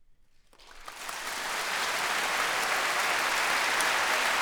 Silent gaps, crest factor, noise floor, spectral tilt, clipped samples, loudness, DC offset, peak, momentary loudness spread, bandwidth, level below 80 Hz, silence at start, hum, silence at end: none; 20 dB; -58 dBFS; 0.5 dB/octave; under 0.1%; -27 LUFS; under 0.1%; -10 dBFS; 12 LU; over 20 kHz; -60 dBFS; 0.1 s; none; 0 s